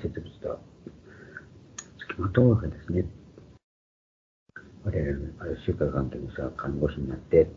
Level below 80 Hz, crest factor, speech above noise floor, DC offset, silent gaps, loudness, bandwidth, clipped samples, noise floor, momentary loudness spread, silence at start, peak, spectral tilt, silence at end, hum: -44 dBFS; 22 dB; 22 dB; under 0.1%; 3.64-4.46 s; -29 LUFS; 7.6 kHz; under 0.1%; -48 dBFS; 25 LU; 0 s; -6 dBFS; -8 dB/octave; 0 s; none